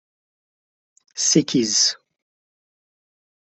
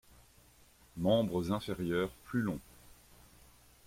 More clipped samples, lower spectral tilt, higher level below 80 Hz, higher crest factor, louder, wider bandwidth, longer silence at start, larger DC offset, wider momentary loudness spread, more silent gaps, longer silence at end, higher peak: neither; second, -2.5 dB/octave vs -6.5 dB/octave; second, -66 dBFS vs -60 dBFS; about the same, 22 dB vs 20 dB; first, -18 LUFS vs -34 LUFS; second, 8.4 kHz vs 16.5 kHz; first, 1.15 s vs 0.95 s; neither; first, 18 LU vs 9 LU; neither; first, 1.5 s vs 0.95 s; first, -4 dBFS vs -18 dBFS